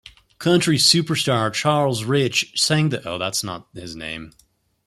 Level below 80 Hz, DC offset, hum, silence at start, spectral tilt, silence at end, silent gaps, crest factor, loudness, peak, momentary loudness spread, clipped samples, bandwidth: -56 dBFS; under 0.1%; none; 0.4 s; -4 dB/octave; 0.55 s; none; 20 dB; -19 LUFS; -2 dBFS; 17 LU; under 0.1%; 14.5 kHz